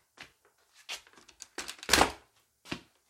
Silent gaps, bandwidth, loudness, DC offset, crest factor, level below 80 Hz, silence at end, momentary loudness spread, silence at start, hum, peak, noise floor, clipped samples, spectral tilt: none; 16.5 kHz; -31 LUFS; under 0.1%; 32 dB; -54 dBFS; 0.3 s; 27 LU; 0.2 s; none; -4 dBFS; -67 dBFS; under 0.1%; -1.5 dB/octave